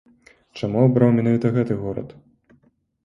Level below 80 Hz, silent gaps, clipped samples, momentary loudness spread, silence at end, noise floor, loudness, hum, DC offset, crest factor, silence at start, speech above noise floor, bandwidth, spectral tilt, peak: -54 dBFS; none; under 0.1%; 18 LU; 0.95 s; -61 dBFS; -20 LUFS; none; under 0.1%; 18 dB; 0.55 s; 42 dB; 7 kHz; -9.5 dB/octave; -2 dBFS